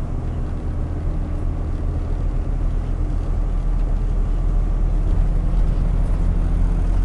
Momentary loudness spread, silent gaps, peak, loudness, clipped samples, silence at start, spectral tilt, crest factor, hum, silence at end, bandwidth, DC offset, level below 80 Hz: 4 LU; none; -8 dBFS; -24 LUFS; under 0.1%; 0 s; -9 dB/octave; 12 dB; none; 0 s; 3.4 kHz; under 0.1%; -20 dBFS